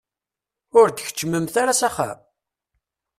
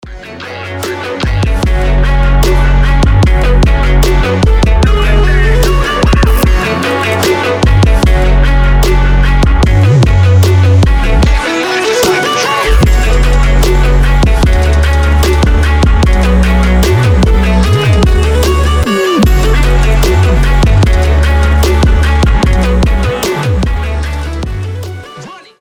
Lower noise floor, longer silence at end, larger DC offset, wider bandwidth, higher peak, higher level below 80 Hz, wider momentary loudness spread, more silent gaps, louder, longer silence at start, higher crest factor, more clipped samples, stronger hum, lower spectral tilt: first, -88 dBFS vs -30 dBFS; first, 1.05 s vs 0.2 s; neither; about the same, 15 kHz vs 16.5 kHz; second, -4 dBFS vs 0 dBFS; second, -62 dBFS vs -10 dBFS; first, 11 LU vs 6 LU; neither; second, -20 LUFS vs -10 LUFS; first, 0.75 s vs 0.05 s; first, 20 dB vs 8 dB; neither; neither; second, -3.5 dB/octave vs -6 dB/octave